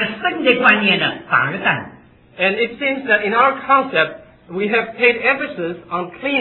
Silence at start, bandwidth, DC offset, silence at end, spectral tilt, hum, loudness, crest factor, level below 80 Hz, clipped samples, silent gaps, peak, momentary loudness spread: 0 s; 5.2 kHz; under 0.1%; 0 s; -7.5 dB/octave; none; -16 LUFS; 18 dB; -58 dBFS; under 0.1%; none; 0 dBFS; 11 LU